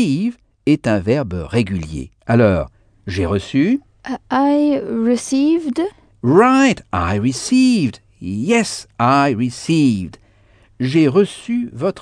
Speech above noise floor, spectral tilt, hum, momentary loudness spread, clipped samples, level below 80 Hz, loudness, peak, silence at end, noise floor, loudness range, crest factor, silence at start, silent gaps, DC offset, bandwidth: 35 dB; -6 dB/octave; none; 11 LU; under 0.1%; -42 dBFS; -17 LUFS; 0 dBFS; 0 s; -51 dBFS; 3 LU; 16 dB; 0 s; none; under 0.1%; 10 kHz